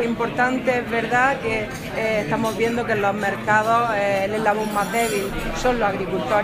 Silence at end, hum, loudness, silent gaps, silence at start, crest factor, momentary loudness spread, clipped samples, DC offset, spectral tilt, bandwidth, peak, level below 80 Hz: 0 s; none; -21 LUFS; none; 0 s; 18 dB; 6 LU; under 0.1%; under 0.1%; -5 dB/octave; 15.5 kHz; -4 dBFS; -40 dBFS